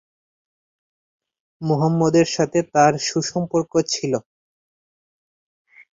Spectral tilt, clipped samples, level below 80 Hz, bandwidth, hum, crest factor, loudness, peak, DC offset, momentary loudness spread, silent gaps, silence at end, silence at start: -5 dB/octave; under 0.1%; -60 dBFS; 7.8 kHz; none; 20 dB; -20 LUFS; -4 dBFS; under 0.1%; 7 LU; none; 1.7 s; 1.6 s